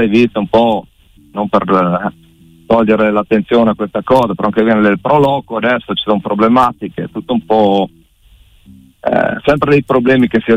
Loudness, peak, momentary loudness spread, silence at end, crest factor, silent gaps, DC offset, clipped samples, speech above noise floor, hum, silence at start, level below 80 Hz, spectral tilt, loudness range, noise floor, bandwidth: -13 LUFS; -2 dBFS; 8 LU; 0 s; 12 dB; none; under 0.1%; under 0.1%; 34 dB; none; 0 s; -44 dBFS; -7.5 dB/octave; 3 LU; -46 dBFS; 10 kHz